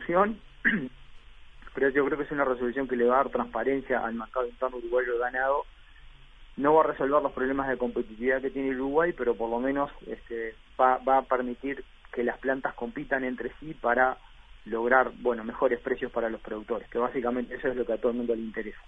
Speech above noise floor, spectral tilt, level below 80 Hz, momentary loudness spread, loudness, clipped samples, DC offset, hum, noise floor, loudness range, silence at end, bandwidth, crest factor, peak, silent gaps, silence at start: 22 dB; -8 dB/octave; -52 dBFS; 12 LU; -28 LUFS; under 0.1%; under 0.1%; none; -50 dBFS; 3 LU; 0.05 s; 3.9 kHz; 22 dB; -6 dBFS; none; 0 s